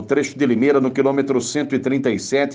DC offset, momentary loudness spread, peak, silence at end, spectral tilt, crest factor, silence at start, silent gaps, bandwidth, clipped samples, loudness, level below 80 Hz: under 0.1%; 5 LU; -4 dBFS; 0 s; -5 dB/octave; 14 dB; 0 s; none; 9.8 kHz; under 0.1%; -19 LUFS; -62 dBFS